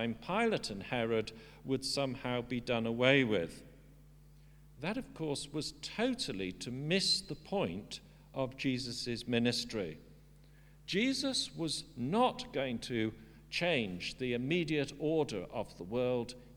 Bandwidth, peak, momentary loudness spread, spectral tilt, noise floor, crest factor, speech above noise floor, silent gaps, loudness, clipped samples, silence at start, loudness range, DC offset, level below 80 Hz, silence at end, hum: 19.5 kHz; -12 dBFS; 9 LU; -4.5 dB/octave; -59 dBFS; 24 dB; 24 dB; none; -35 LUFS; under 0.1%; 0 s; 4 LU; under 0.1%; -60 dBFS; 0 s; none